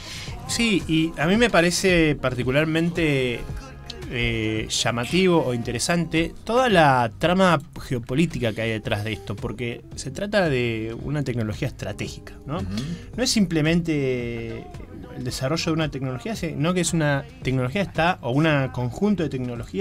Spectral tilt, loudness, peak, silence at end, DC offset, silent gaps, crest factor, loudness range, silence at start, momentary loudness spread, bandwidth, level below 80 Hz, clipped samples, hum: -5 dB/octave; -23 LUFS; -4 dBFS; 0 s; under 0.1%; none; 18 dB; 6 LU; 0 s; 13 LU; 16 kHz; -42 dBFS; under 0.1%; none